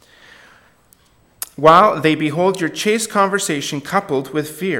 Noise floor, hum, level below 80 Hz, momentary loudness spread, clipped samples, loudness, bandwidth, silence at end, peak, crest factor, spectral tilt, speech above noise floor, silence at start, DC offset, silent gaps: -54 dBFS; none; -58 dBFS; 12 LU; under 0.1%; -16 LUFS; 17 kHz; 0 s; 0 dBFS; 18 dB; -4 dB/octave; 38 dB; 1.6 s; under 0.1%; none